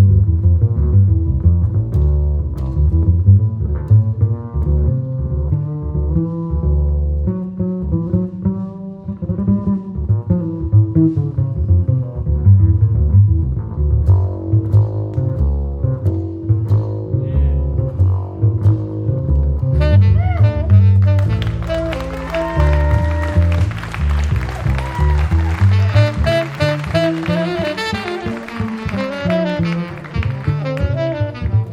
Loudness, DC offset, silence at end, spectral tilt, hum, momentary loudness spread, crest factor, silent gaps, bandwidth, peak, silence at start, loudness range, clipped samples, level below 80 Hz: -17 LUFS; under 0.1%; 0 s; -8.5 dB/octave; none; 9 LU; 14 dB; none; 7 kHz; 0 dBFS; 0 s; 5 LU; under 0.1%; -22 dBFS